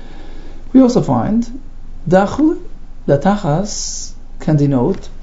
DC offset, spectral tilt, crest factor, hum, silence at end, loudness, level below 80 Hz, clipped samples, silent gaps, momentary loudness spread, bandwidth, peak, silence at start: under 0.1%; -6.5 dB/octave; 16 dB; none; 0 s; -15 LUFS; -28 dBFS; under 0.1%; none; 15 LU; 8 kHz; 0 dBFS; 0 s